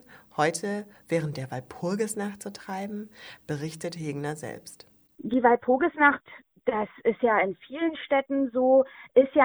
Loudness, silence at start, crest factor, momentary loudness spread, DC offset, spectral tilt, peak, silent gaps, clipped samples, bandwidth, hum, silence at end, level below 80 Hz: -27 LUFS; 0.4 s; 22 dB; 16 LU; under 0.1%; -5.5 dB/octave; -6 dBFS; none; under 0.1%; over 20 kHz; none; 0 s; -66 dBFS